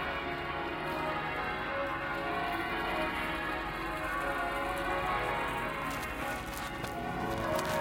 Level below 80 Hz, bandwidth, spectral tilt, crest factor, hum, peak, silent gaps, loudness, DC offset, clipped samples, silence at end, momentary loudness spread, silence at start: -50 dBFS; 17 kHz; -4.5 dB/octave; 20 dB; none; -16 dBFS; none; -34 LUFS; under 0.1%; under 0.1%; 0 s; 4 LU; 0 s